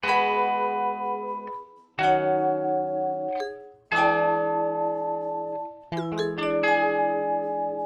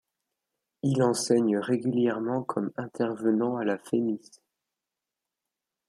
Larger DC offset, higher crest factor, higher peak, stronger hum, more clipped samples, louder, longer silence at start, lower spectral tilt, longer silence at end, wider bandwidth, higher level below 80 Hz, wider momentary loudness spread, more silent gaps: neither; about the same, 16 dB vs 18 dB; about the same, -10 dBFS vs -10 dBFS; neither; neither; first, -25 LUFS vs -28 LUFS; second, 0 s vs 0.85 s; about the same, -6 dB/octave vs -6 dB/octave; second, 0 s vs 1.7 s; second, 9.8 kHz vs 13 kHz; first, -64 dBFS vs -74 dBFS; first, 12 LU vs 8 LU; neither